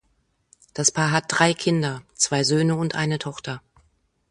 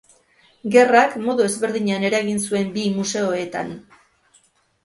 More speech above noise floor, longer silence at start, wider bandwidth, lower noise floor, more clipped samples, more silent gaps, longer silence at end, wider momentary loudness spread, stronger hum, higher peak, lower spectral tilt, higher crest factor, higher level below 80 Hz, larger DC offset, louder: first, 46 dB vs 40 dB; about the same, 0.75 s vs 0.65 s; about the same, 11.5 kHz vs 11.5 kHz; first, -68 dBFS vs -59 dBFS; neither; neither; second, 0.75 s vs 1.05 s; about the same, 14 LU vs 14 LU; neither; about the same, -2 dBFS vs 0 dBFS; about the same, -3.5 dB/octave vs -4.5 dB/octave; about the same, 22 dB vs 20 dB; about the same, -60 dBFS vs -62 dBFS; neither; second, -22 LUFS vs -19 LUFS